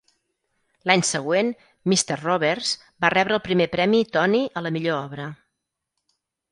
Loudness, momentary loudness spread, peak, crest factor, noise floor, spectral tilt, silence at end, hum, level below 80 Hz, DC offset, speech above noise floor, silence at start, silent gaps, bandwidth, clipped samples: -22 LUFS; 9 LU; 0 dBFS; 24 dB; -80 dBFS; -4 dB/octave; 1.15 s; none; -62 dBFS; under 0.1%; 59 dB; 0.85 s; none; 11.5 kHz; under 0.1%